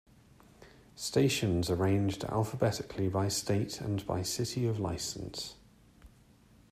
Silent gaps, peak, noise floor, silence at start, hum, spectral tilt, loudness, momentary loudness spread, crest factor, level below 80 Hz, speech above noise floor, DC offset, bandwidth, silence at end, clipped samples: none; -14 dBFS; -61 dBFS; 0.6 s; none; -5 dB/octave; -32 LUFS; 9 LU; 18 dB; -58 dBFS; 29 dB; under 0.1%; 15.5 kHz; 0.65 s; under 0.1%